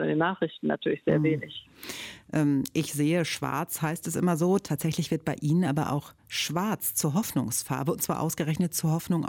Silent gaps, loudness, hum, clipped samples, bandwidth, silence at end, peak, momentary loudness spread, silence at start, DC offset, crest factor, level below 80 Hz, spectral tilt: none; -28 LUFS; none; under 0.1%; 17.5 kHz; 0 s; -12 dBFS; 7 LU; 0 s; under 0.1%; 16 dB; -62 dBFS; -5 dB/octave